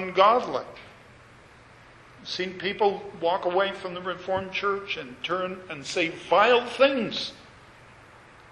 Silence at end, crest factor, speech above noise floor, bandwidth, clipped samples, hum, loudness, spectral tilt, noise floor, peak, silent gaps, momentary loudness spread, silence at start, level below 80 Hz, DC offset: 1 s; 24 dB; 26 dB; 11.5 kHz; under 0.1%; none; -26 LUFS; -4 dB/octave; -51 dBFS; -4 dBFS; none; 14 LU; 0 s; -62 dBFS; under 0.1%